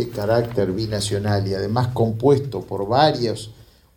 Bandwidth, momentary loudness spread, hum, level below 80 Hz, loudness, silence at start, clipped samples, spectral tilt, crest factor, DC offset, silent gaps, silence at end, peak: 18 kHz; 9 LU; none; -46 dBFS; -21 LUFS; 0 s; under 0.1%; -6 dB/octave; 18 dB; under 0.1%; none; 0.35 s; -2 dBFS